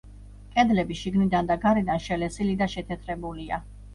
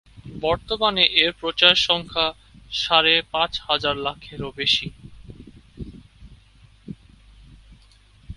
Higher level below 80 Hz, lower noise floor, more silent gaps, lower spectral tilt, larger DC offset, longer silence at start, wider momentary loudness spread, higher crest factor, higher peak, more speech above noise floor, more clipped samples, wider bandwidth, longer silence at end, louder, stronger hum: about the same, -44 dBFS vs -46 dBFS; second, -45 dBFS vs -53 dBFS; neither; first, -6.5 dB/octave vs -3 dB/octave; neither; about the same, 0.05 s vs 0.15 s; second, 11 LU vs 24 LU; second, 18 dB vs 24 dB; second, -8 dBFS vs 0 dBFS; second, 19 dB vs 31 dB; neither; about the same, 11.5 kHz vs 11.5 kHz; about the same, 0 s vs 0.05 s; second, -26 LUFS vs -19 LUFS; first, 50 Hz at -40 dBFS vs none